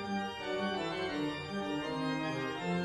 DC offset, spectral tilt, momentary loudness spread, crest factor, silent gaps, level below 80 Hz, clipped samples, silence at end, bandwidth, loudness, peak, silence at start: under 0.1%; -5.5 dB/octave; 2 LU; 14 dB; none; -66 dBFS; under 0.1%; 0 s; 12.5 kHz; -36 LUFS; -22 dBFS; 0 s